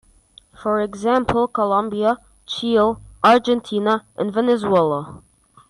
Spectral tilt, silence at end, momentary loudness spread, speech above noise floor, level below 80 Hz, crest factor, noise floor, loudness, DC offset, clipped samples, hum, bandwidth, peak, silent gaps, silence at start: -6 dB/octave; 0.55 s; 10 LU; 33 dB; -50 dBFS; 14 dB; -51 dBFS; -19 LUFS; under 0.1%; under 0.1%; none; 11 kHz; -6 dBFS; none; 0.6 s